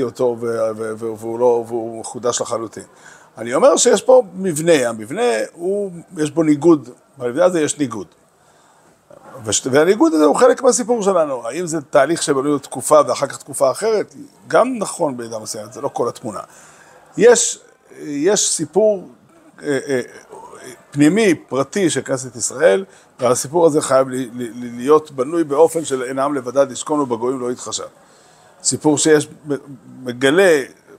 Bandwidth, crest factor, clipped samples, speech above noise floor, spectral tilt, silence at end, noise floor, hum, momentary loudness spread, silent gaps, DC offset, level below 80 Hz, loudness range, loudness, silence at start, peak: 15.5 kHz; 18 dB; under 0.1%; 35 dB; -4 dB/octave; 0.05 s; -52 dBFS; none; 15 LU; none; under 0.1%; -66 dBFS; 4 LU; -17 LUFS; 0 s; 0 dBFS